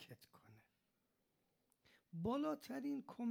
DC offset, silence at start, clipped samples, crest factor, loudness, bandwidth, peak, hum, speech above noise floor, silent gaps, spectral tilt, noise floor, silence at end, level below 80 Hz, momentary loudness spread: under 0.1%; 0 s; under 0.1%; 18 dB; -45 LUFS; 17 kHz; -30 dBFS; none; 42 dB; none; -7 dB/octave; -85 dBFS; 0 s; -78 dBFS; 18 LU